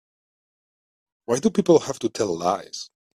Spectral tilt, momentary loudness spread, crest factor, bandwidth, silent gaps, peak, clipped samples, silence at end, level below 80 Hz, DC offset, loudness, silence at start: -5.5 dB/octave; 17 LU; 20 dB; 13.5 kHz; none; -4 dBFS; under 0.1%; 0.3 s; -64 dBFS; under 0.1%; -22 LUFS; 1.3 s